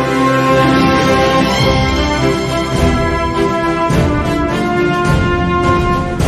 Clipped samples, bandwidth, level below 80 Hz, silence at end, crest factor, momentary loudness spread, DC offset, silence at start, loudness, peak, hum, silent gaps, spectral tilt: under 0.1%; 13.5 kHz; -24 dBFS; 0 s; 12 dB; 4 LU; under 0.1%; 0 s; -13 LUFS; 0 dBFS; none; none; -6 dB/octave